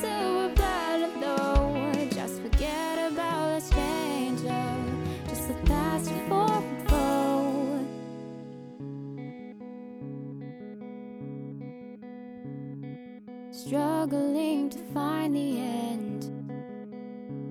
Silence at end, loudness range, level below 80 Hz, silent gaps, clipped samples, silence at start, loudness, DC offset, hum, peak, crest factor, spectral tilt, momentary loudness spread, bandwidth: 0 s; 13 LU; -36 dBFS; none; under 0.1%; 0 s; -29 LUFS; under 0.1%; none; -10 dBFS; 18 dB; -6 dB/octave; 16 LU; 18.5 kHz